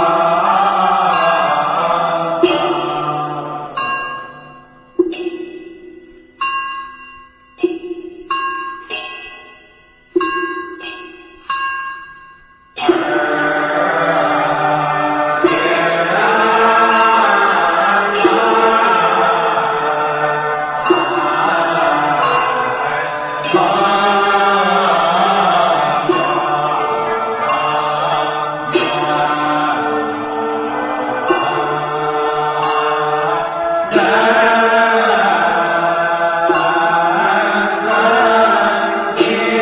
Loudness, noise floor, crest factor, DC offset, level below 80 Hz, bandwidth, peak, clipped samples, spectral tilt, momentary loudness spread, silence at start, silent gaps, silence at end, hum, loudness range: -14 LUFS; -47 dBFS; 14 dB; under 0.1%; -54 dBFS; 4 kHz; 0 dBFS; under 0.1%; -8 dB/octave; 12 LU; 0 s; none; 0 s; none; 11 LU